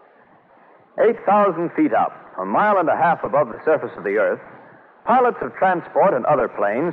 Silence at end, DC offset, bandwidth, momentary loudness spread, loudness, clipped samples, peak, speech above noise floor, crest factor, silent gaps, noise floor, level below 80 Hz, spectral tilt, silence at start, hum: 0 s; under 0.1%; 4.3 kHz; 6 LU; -19 LUFS; under 0.1%; -6 dBFS; 33 dB; 14 dB; none; -52 dBFS; -62 dBFS; -9 dB/octave; 0.95 s; none